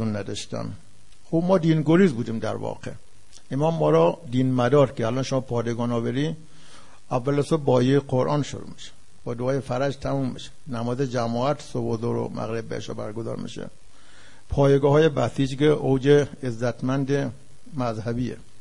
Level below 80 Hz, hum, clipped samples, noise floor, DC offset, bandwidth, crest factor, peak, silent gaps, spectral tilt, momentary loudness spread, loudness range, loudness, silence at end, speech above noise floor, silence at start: -50 dBFS; none; under 0.1%; -52 dBFS; 1%; 11 kHz; 18 dB; -6 dBFS; none; -7 dB/octave; 14 LU; 6 LU; -24 LUFS; 0.2 s; 29 dB; 0 s